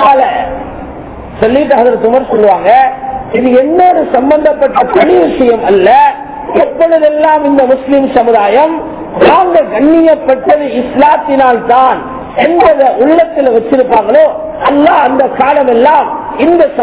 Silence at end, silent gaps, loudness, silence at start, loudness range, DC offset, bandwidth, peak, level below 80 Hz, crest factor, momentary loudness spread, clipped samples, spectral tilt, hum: 0 s; none; -8 LUFS; 0 s; 1 LU; under 0.1%; 4 kHz; 0 dBFS; -38 dBFS; 8 dB; 8 LU; 5%; -9.5 dB/octave; none